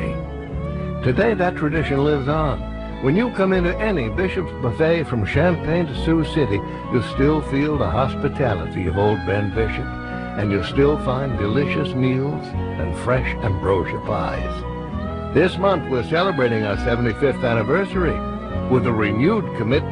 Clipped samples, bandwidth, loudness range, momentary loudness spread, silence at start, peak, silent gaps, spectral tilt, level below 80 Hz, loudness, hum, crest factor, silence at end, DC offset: under 0.1%; 10.5 kHz; 2 LU; 8 LU; 0 s; -4 dBFS; none; -8 dB/octave; -32 dBFS; -21 LUFS; none; 16 dB; 0 s; under 0.1%